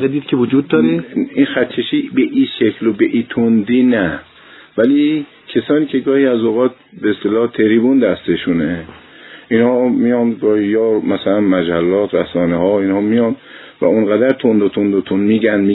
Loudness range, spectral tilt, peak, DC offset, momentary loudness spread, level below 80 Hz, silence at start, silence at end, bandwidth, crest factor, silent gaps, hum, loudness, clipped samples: 1 LU; -10.5 dB/octave; 0 dBFS; under 0.1%; 6 LU; -52 dBFS; 0 s; 0 s; 4.1 kHz; 14 dB; none; none; -14 LUFS; under 0.1%